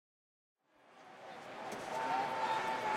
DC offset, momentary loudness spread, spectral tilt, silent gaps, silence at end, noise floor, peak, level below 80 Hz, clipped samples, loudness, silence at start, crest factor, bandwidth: under 0.1%; 17 LU; -3 dB/octave; none; 0 s; -63 dBFS; -24 dBFS; -80 dBFS; under 0.1%; -38 LUFS; 0.9 s; 18 dB; 16 kHz